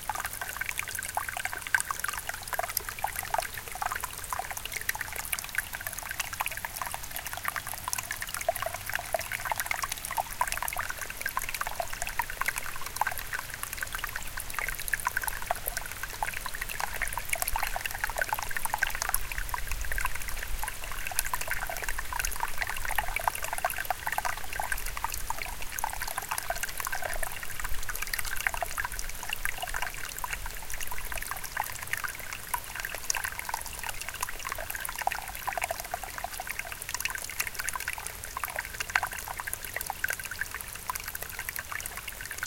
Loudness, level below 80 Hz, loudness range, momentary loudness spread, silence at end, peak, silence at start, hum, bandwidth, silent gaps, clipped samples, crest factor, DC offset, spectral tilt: -33 LUFS; -44 dBFS; 2 LU; 5 LU; 0 s; -2 dBFS; 0 s; none; 17 kHz; none; under 0.1%; 30 dB; under 0.1%; -1 dB/octave